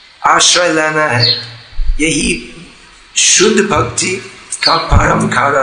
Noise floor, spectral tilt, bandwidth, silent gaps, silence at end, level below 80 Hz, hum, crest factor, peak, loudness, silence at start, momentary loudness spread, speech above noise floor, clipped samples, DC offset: -39 dBFS; -2.5 dB/octave; 12 kHz; none; 0 s; -24 dBFS; none; 12 dB; 0 dBFS; -11 LUFS; 0.2 s; 14 LU; 28 dB; 0.3%; under 0.1%